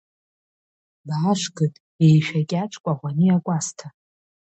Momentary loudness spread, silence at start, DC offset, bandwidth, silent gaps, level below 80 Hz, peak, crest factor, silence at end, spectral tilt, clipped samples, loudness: 10 LU; 1.05 s; under 0.1%; 8.4 kHz; 1.80-1.99 s, 2.80-2.84 s; -66 dBFS; -6 dBFS; 16 dB; 0.6 s; -6 dB/octave; under 0.1%; -22 LUFS